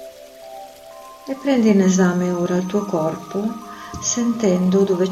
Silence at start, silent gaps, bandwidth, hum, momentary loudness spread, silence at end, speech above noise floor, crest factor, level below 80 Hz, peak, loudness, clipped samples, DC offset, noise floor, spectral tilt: 0 s; none; 14 kHz; none; 23 LU; 0 s; 22 dB; 16 dB; -54 dBFS; -4 dBFS; -19 LUFS; under 0.1%; under 0.1%; -40 dBFS; -5.5 dB/octave